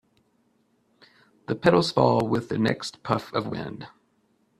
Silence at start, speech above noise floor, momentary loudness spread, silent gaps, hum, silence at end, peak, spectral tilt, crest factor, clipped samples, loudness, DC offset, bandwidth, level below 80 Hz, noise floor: 1.5 s; 43 dB; 18 LU; none; none; 0.7 s; -4 dBFS; -6 dB/octave; 24 dB; under 0.1%; -24 LUFS; under 0.1%; 13.5 kHz; -60 dBFS; -67 dBFS